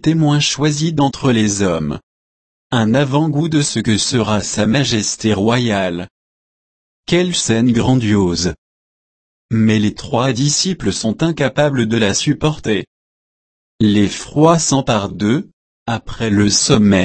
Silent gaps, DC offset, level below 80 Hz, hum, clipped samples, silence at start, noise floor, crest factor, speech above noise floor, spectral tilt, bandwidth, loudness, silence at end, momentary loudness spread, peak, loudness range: 2.03-2.70 s, 6.11-7.03 s, 8.58-9.49 s, 12.87-13.79 s, 15.53-15.86 s; under 0.1%; -42 dBFS; none; under 0.1%; 0 s; under -90 dBFS; 16 dB; over 75 dB; -4.5 dB/octave; 8.8 kHz; -15 LUFS; 0 s; 8 LU; 0 dBFS; 2 LU